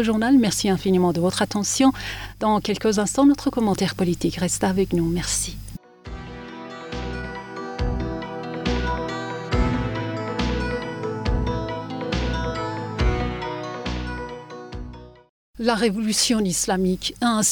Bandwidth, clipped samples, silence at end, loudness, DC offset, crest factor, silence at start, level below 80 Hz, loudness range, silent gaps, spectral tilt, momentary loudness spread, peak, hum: over 20 kHz; under 0.1%; 0 s; -23 LUFS; under 0.1%; 16 dB; 0 s; -34 dBFS; 8 LU; 15.29-15.54 s; -4.5 dB/octave; 17 LU; -6 dBFS; none